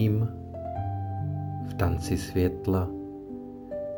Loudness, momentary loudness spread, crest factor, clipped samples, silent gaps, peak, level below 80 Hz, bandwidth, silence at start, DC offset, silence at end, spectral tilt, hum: -31 LUFS; 12 LU; 18 dB; under 0.1%; none; -12 dBFS; -48 dBFS; 19.5 kHz; 0 s; under 0.1%; 0 s; -7.5 dB/octave; none